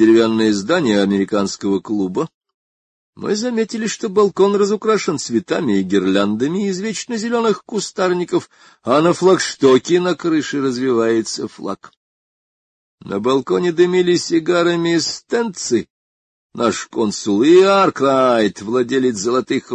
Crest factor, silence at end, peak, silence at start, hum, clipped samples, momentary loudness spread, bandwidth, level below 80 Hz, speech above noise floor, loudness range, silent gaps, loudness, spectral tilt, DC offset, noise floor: 16 dB; 0 s; -2 dBFS; 0 s; none; under 0.1%; 8 LU; 9.6 kHz; -58 dBFS; over 74 dB; 4 LU; 2.34-2.41 s, 2.54-3.13 s, 11.97-12.98 s, 15.90-16.50 s; -17 LUFS; -5 dB/octave; under 0.1%; under -90 dBFS